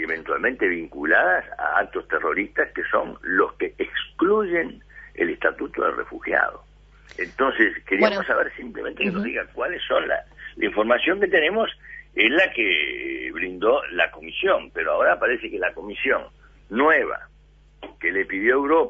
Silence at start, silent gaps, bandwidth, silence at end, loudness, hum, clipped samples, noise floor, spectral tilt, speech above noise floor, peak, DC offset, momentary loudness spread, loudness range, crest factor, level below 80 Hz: 0 s; none; 7.4 kHz; 0 s; -22 LUFS; none; under 0.1%; -52 dBFS; -6 dB/octave; 30 dB; -2 dBFS; under 0.1%; 9 LU; 3 LU; 20 dB; -52 dBFS